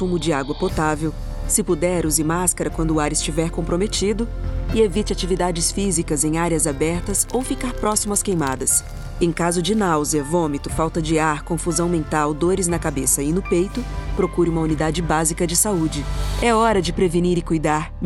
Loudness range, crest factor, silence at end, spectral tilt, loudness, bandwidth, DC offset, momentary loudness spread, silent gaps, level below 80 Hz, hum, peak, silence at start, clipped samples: 1 LU; 18 dB; 0 s; -4.5 dB/octave; -20 LUFS; 16.5 kHz; under 0.1%; 5 LU; none; -30 dBFS; none; -2 dBFS; 0 s; under 0.1%